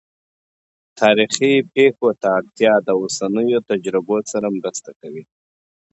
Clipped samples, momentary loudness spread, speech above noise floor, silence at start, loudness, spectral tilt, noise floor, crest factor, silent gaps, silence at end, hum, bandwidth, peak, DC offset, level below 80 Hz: under 0.1%; 14 LU; over 73 dB; 0.95 s; -17 LUFS; -4 dB/octave; under -90 dBFS; 18 dB; 4.96-5.00 s; 0.7 s; none; 8.2 kHz; 0 dBFS; under 0.1%; -66 dBFS